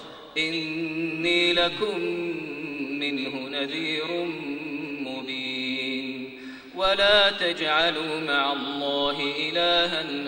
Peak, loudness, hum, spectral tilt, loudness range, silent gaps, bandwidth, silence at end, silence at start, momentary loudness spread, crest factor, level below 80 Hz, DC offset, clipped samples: -6 dBFS; -25 LUFS; none; -4 dB/octave; 7 LU; none; 16 kHz; 0 s; 0 s; 12 LU; 20 dB; -58 dBFS; under 0.1%; under 0.1%